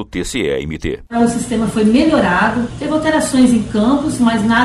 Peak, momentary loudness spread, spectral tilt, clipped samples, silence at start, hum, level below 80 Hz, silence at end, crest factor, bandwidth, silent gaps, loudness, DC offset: -2 dBFS; 9 LU; -5 dB/octave; under 0.1%; 0 s; none; -36 dBFS; 0 s; 12 dB; 13 kHz; none; -15 LUFS; under 0.1%